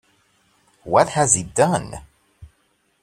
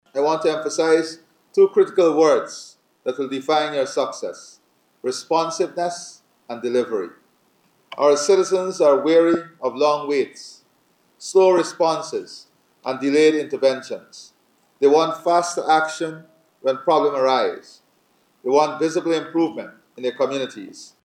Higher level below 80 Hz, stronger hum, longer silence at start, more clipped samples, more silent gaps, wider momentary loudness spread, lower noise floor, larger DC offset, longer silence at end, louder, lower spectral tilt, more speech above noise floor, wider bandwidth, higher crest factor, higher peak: first, -50 dBFS vs -78 dBFS; neither; first, 0.85 s vs 0.15 s; neither; neither; about the same, 17 LU vs 18 LU; about the same, -65 dBFS vs -62 dBFS; neither; first, 0.55 s vs 0.2 s; about the same, -18 LUFS vs -20 LUFS; about the same, -4 dB/octave vs -4 dB/octave; first, 46 dB vs 42 dB; first, 15.5 kHz vs 11 kHz; first, 22 dB vs 16 dB; first, 0 dBFS vs -4 dBFS